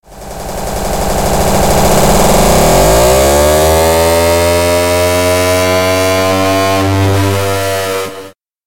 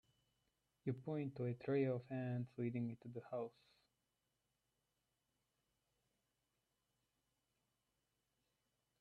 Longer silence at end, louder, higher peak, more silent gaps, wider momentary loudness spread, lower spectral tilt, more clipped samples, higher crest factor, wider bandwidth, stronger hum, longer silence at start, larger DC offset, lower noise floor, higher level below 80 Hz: second, 0 s vs 5.5 s; first, -10 LUFS vs -45 LUFS; first, 0 dBFS vs -30 dBFS; neither; about the same, 10 LU vs 9 LU; second, -4 dB/octave vs -10 dB/octave; neither; second, 10 dB vs 20 dB; first, 17.5 kHz vs 4.7 kHz; neither; second, 0 s vs 0.85 s; neither; second, -32 dBFS vs -88 dBFS; first, -22 dBFS vs -86 dBFS